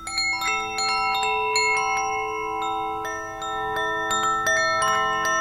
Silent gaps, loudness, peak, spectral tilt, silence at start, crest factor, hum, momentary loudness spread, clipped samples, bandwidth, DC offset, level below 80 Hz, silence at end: none; -23 LUFS; -8 dBFS; -1 dB/octave; 0 s; 16 dB; none; 8 LU; under 0.1%; 16.5 kHz; under 0.1%; -52 dBFS; 0 s